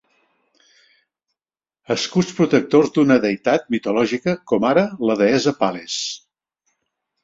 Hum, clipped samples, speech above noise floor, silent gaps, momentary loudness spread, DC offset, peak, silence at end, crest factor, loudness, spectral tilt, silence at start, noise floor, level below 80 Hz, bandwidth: none; under 0.1%; over 72 dB; none; 9 LU; under 0.1%; -2 dBFS; 1.05 s; 18 dB; -19 LUFS; -5 dB/octave; 1.9 s; under -90 dBFS; -60 dBFS; 7.8 kHz